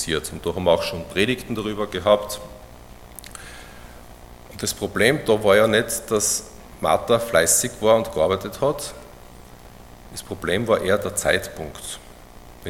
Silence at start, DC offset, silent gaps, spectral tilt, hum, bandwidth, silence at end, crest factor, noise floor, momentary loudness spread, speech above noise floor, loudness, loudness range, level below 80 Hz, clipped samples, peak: 0 s; under 0.1%; none; -3 dB/octave; 60 Hz at -50 dBFS; 17 kHz; 0 s; 22 dB; -43 dBFS; 21 LU; 22 dB; -21 LUFS; 7 LU; -46 dBFS; under 0.1%; -2 dBFS